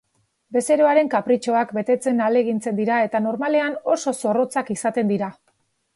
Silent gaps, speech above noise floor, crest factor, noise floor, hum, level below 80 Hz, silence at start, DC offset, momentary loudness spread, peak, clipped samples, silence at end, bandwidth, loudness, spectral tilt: none; 47 dB; 16 dB; -67 dBFS; none; -70 dBFS; 0.5 s; under 0.1%; 6 LU; -4 dBFS; under 0.1%; 0.65 s; 12 kHz; -21 LUFS; -5.5 dB/octave